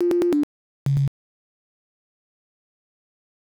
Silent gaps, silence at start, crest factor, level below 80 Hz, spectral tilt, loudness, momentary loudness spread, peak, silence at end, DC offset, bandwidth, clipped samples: 0.43-0.86 s; 0 s; 12 dB; -54 dBFS; -9 dB/octave; -24 LUFS; 10 LU; -14 dBFS; 2.35 s; under 0.1%; 14 kHz; under 0.1%